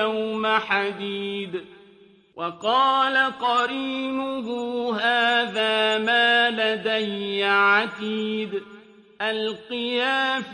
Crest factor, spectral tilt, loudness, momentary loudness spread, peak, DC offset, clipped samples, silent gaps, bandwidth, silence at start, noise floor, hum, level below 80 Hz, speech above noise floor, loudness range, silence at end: 16 dB; -4 dB/octave; -22 LUFS; 11 LU; -6 dBFS; under 0.1%; under 0.1%; none; 10.5 kHz; 0 s; -53 dBFS; none; -70 dBFS; 30 dB; 4 LU; 0 s